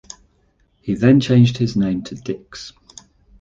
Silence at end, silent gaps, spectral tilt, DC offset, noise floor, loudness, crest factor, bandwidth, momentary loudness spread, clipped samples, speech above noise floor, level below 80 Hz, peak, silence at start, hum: 0.7 s; none; -7 dB/octave; under 0.1%; -60 dBFS; -17 LUFS; 16 dB; 7.6 kHz; 22 LU; under 0.1%; 44 dB; -48 dBFS; -2 dBFS; 0.85 s; none